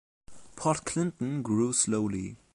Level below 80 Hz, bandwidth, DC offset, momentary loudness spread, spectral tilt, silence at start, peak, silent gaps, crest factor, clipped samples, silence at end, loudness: -58 dBFS; 11.5 kHz; under 0.1%; 8 LU; -5 dB/octave; 0.3 s; -14 dBFS; none; 16 dB; under 0.1%; 0.2 s; -29 LUFS